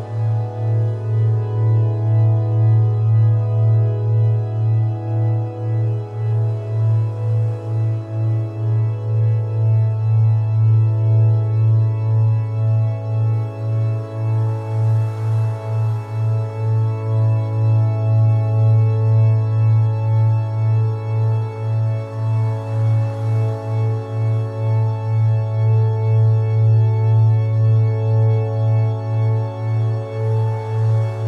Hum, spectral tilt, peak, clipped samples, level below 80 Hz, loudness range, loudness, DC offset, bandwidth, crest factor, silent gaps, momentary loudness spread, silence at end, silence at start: none; -10 dB/octave; -8 dBFS; under 0.1%; -56 dBFS; 4 LU; -18 LUFS; under 0.1%; 3.5 kHz; 8 dB; none; 6 LU; 0 s; 0 s